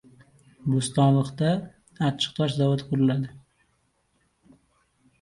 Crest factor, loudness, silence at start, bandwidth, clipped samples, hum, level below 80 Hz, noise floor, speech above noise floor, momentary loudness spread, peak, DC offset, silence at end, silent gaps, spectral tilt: 18 dB; -25 LUFS; 0.65 s; 11.5 kHz; under 0.1%; none; -60 dBFS; -70 dBFS; 46 dB; 9 LU; -8 dBFS; under 0.1%; 1.85 s; none; -6.5 dB/octave